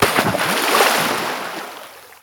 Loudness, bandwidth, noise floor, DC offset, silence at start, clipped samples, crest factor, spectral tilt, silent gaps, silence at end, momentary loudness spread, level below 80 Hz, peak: -17 LUFS; over 20 kHz; -38 dBFS; under 0.1%; 0 s; under 0.1%; 18 dB; -2.5 dB/octave; none; 0.1 s; 19 LU; -52 dBFS; -2 dBFS